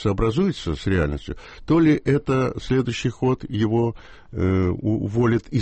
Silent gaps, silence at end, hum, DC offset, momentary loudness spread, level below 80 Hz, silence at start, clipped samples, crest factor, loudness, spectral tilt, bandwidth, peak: none; 0 s; none; under 0.1%; 8 LU; -38 dBFS; 0 s; under 0.1%; 14 dB; -22 LUFS; -7.5 dB/octave; 8.4 kHz; -8 dBFS